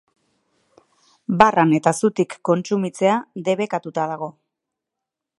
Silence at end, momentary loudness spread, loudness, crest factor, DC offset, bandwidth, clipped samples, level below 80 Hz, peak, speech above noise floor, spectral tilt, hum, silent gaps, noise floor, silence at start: 1.1 s; 11 LU; -20 LUFS; 22 dB; under 0.1%; 11.5 kHz; under 0.1%; -58 dBFS; 0 dBFS; 65 dB; -6 dB/octave; none; none; -84 dBFS; 1.3 s